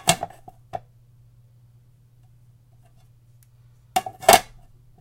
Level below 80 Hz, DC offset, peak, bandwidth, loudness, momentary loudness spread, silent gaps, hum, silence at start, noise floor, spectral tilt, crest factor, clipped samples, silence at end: -52 dBFS; under 0.1%; 0 dBFS; 16.5 kHz; -20 LUFS; 22 LU; none; none; 0.05 s; -54 dBFS; -2 dB/octave; 26 dB; under 0.1%; 0.6 s